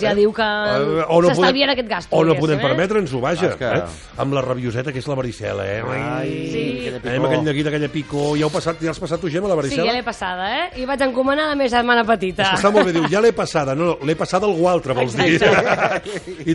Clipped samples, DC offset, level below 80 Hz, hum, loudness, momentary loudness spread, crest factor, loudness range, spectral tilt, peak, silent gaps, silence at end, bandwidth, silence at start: under 0.1%; under 0.1%; -46 dBFS; none; -19 LUFS; 9 LU; 16 dB; 5 LU; -5.5 dB/octave; -2 dBFS; none; 0 s; 11.5 kHz; 0 s